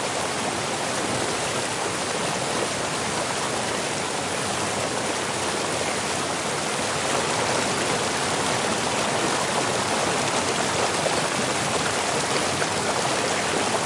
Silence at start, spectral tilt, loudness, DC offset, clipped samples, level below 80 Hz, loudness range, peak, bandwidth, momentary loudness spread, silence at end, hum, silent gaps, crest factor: 0 s; -2.5 dB/octave; -24 LUFS; under 0.1%; under 0.1%; -56 dBFS; 2 LU; -8 dBFS; 11.5 kHz; 3 LU; 0 s; none; none; 18 dB